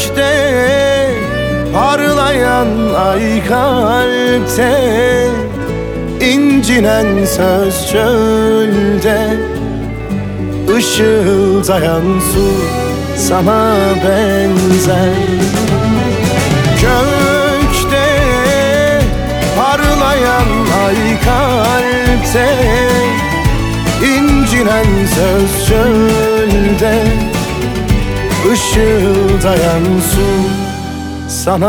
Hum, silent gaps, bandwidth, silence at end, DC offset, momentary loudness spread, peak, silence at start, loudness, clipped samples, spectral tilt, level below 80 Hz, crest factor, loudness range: none; none; over 20 kHz; 0 s; under 0.1%; 5 LU; 0 dBFS; 0 s; -11 LUFS; under 0.1%; -5 dB/octave; -22 dBFS; 10 dB; 1 LU